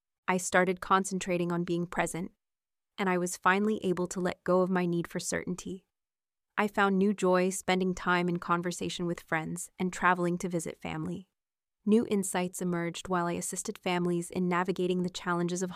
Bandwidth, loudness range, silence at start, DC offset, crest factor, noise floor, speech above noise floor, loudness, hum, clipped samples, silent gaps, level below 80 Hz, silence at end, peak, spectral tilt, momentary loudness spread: 15.5 kHz; 3 LU; 0.3 s; under 0.1%; 20 dB; under -90 dBFS; over 60 dB; -30 LUFS; none; under 0.1%; none; -62 dBFS; 0 s; -10 dBFS; -5 dB/octave; 10 LU